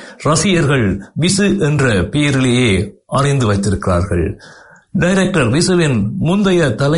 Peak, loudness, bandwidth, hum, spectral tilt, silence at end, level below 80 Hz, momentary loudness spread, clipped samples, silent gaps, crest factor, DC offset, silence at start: -2 dBFS; -14 LUFS; 11 kHz; none; -5.5 dB/octave; 0 s; -36 dBFS; 6 LU; under 0.1%; none; 12 dB; under 0.1%; 0 s